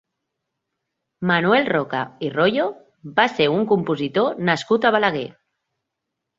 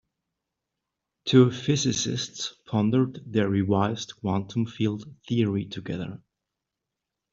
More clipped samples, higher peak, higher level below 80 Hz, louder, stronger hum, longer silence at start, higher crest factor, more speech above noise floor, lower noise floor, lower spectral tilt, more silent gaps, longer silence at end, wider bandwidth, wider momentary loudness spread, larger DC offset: neither; first, -2 dBFS vs -6 dBFS; about the same, -62 dBFS vs -62 dBFS; first, -20 LUFS vs -26 LUFS; neither; about the same, 1.2 s vs 1.25 s; about the same, 20 dB vs 22 dB; about the same, 61 dB vs 60 dB; second, -81 dBFS vs -86 dBFS; about the same, -6 dB/octave vs -5.5 dB/octave; neither; about the same, 1.05 s vs 1.15 s; about the same, 7.8 kHz vs 7.8 kHz; second, 10 LU vs 13 LU; neither